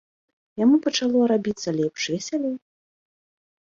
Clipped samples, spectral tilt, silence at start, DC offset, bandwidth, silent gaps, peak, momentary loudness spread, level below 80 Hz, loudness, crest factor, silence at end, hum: under 0.1%; -4.5 dB/octave; 0.55 s; under 0.1%; 7.6 kHz; none; -8 dBFS; 10 LU; -66 dBFS; -23 LUFS; 16 dB; 1.05 s; none